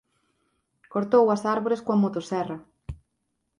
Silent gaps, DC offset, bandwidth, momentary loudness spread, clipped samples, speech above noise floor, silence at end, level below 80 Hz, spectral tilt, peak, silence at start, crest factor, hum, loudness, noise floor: none; under 0.1%; 11 kHz; 22 LU; under 0.1%; 54 dB; 0.65 s; -54 dBFS; -7.5 dB/octave; -8 dBFS; 0.9 s; 18 dB; none; -24 LUFS; -77 dBFS